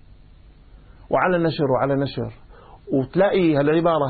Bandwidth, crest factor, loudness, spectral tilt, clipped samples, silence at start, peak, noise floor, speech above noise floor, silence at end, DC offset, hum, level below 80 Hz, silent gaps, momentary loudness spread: 4.8 kHz; 14 dB; -20 LUFS; -12 dB/octave; under 0.1%; 1.1 s; -6 dBFS; -47 dBFS; 28 dB; 0 s; under 0.1%; none; -48 dBFS; none; 8 LU